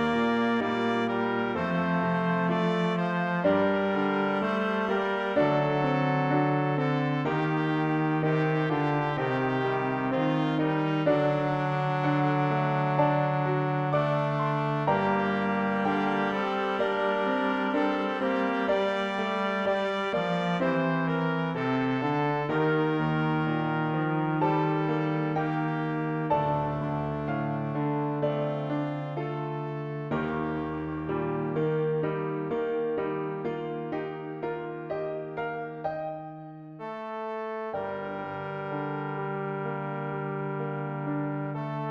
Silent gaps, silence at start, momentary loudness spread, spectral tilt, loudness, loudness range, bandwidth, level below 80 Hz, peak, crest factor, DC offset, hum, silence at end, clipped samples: none; 0 s; 8 LU; -8 dB/octave; -28 LUFS; 7 LU; 7.4 kHz; -60 dBFS; -12 dBFS; 16 dB; under 0.1%; none; 0 s; under 0.1%